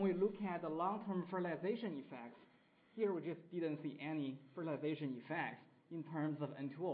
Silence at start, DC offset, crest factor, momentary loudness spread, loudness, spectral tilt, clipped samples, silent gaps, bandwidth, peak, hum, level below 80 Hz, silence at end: 0 s; under 0.1%; 16 dB; 10 LU; -43 LUFS; -6.5 dB/octave; under 0.1%; none; 4.9 kHz; -26 dBFS; none; -86 dBFS; 0 s